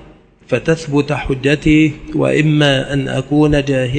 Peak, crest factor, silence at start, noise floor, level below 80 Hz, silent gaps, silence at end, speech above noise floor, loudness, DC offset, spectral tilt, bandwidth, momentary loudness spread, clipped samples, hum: 0 dBFS; 14 dB; 0.5 s; -42 dBFS; -34 dBFS; none; 0 s; 29 dB; -14 LUFS; under 0.1%; -6.5 dB/octave; 9 kHz; 6 LU; under 0.1%; none